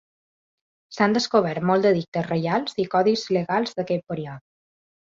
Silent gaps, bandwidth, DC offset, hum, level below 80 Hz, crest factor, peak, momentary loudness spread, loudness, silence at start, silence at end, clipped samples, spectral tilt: 2.08-2.12 s; 7.8 kHz; under 0.1%; none; -64 dBFS; 18 dB; -6 dBFS; 12 LU; -23 LUFS; 0.9 s; 0.65 s; under 0.1%; -6 dB/octave